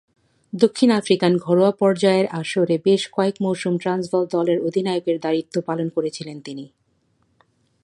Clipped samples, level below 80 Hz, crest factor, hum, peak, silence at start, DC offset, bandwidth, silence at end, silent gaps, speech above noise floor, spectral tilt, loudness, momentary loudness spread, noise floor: under 0.1%; -68 dBFS; 18 dB; none; -2 dBFS; 0.55 s; under 0.1%; 11.5 kHz; 1.2 s; none; 46 dB; -6 dB/octave; -20 LUFS; 11 LU; -65 dBFS